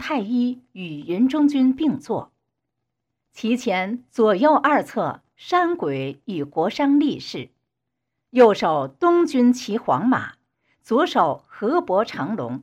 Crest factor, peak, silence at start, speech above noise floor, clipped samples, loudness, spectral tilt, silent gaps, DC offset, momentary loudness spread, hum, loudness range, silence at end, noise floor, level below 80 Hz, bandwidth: 18 dB; -4 dBFS; 0 s; 60 dB; under 0.1%; -21 LUFS; -6 dB/octave; none; under 0.1%; 13 LU; none; 4 LU; 0 s; -81 dBFS; -68 dBFS; 10 kHz